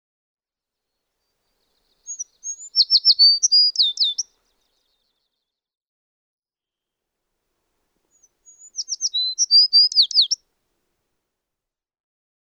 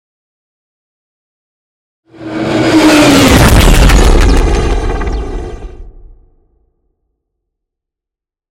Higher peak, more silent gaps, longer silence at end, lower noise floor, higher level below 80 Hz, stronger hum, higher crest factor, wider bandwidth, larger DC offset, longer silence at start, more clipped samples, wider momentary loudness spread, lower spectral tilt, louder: second, -6 dBFS vs 0 dBFS; first, 5.77-6.42 s vs none; second, 2.05 s vs 2.65 s; first, -89 dBFS vs -85 dBFS; second, -80 dBFS vs -14 dBFS; neither; first, 18 dB vs 10 dB; second, 11.5 kHz vs 17 kHz; neither; about the same, 2.1 s vs 2.2 s; second, under 0.1% vs 0.2%; first, 21 LU vs 18 LU; second, 7 dB/octave vs -5 dB/octave; second, -14 LUFS vs -8 LUFS